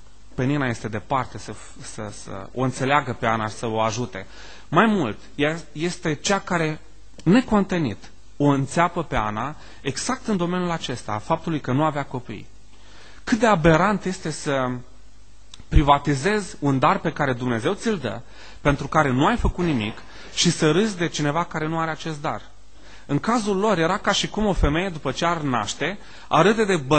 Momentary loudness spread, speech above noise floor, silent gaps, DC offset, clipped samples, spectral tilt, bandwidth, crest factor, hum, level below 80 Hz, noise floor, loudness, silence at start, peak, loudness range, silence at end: 15 LU; 28 dB; none; 1%; under 0.1%; -5 dB/octave; 9 kHz; 22 dB; none; -36 dBFS; -50 dBFS; -22 LUFS; 0.4 s; -2 dBFS; 4 LU; 0 s